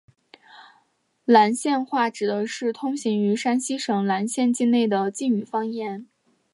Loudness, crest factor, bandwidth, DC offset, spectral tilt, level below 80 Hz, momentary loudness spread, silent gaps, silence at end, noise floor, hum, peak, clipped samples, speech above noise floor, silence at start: -23 LUFS; 20 dB; 11.5 kHz; under 0.1%; -4.5 dB/octave; -78 dBFS; 10 LU; none; 0.5 s; -67 dBFS; none; -4 dBFS; under 0.1%; 45 dB; 0.55 s